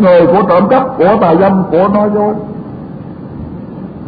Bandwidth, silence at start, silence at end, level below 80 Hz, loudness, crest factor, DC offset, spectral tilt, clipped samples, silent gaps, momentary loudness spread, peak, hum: 5 kHz; 0 s; 0 s; -40 dBFS; -9 LUFS; 10 dB; under 0.1%; -11 dB/octave; under 0.1%; none; 18 LU; 0 dBFS; none